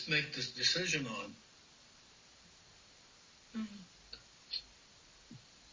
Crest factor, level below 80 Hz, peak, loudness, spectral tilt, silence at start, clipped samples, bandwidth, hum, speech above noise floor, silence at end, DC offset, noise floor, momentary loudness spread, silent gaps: 24 dB; -72 dBFS; -18 dBFS; -36 LUFS; -2.5 dB/octave; 0 s; under 0.1%; 7.6 kHz; none; 25 dB; 0 s; under 0.1%; -62 dBFS; 27 LU; none